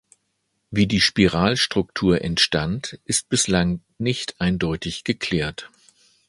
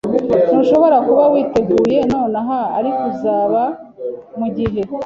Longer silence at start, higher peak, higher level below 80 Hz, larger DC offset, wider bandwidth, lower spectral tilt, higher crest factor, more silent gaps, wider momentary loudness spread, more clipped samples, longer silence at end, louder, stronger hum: first, 0.7 s vs 0.05 s; about the same, -2 dBFS vs -2 dBFS; about the same, -42 dBFS vs -46 dBFS; neither; first, 11.5 kHz vs 7.6 kHz; second, -4 dB/octave vs -8 dB/octave; first, 20 dB vs 14 dB; neither; second, 9 LU vs 12 LU; neither; first, 0.6 s vs 0 s; second, -21 LUFS vs -15 LUFS; neither